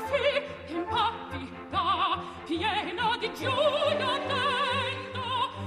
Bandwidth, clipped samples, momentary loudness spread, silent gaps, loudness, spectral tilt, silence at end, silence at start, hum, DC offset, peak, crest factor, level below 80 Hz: 14 kHz; under 0.1%; 8 LU; none; -28 LUFS; -4.5 dB/octave; 0 s; 0 s; none; under 0.1%; -14 dBFS; 14 dB; -58 dBFS